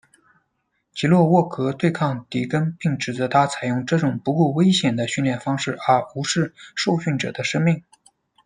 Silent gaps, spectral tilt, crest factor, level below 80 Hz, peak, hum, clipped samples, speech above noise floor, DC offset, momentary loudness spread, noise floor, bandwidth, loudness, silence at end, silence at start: none; -5.5 dB/octave; 18 dB; -62 dBFS; -2 dBFS; none; under 0.1%; 52 dB; under 0.1%; 7 LU; -73 dBFS; 10.5 kHz; -21 LUFS; 0.65 s; 0.95 s